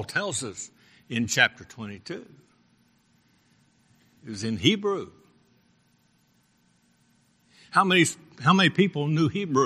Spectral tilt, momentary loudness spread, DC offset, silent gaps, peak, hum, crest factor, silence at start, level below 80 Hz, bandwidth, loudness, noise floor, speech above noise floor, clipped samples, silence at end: -4 dB/octave; 20 LU; under 0.1%; none; -2 dBFS; none; 26 dB; 0 s; -66 dBFS; 15 kHz; -24 LUFS; -66 dBFS; 41 dB; under 0.1%; 0 s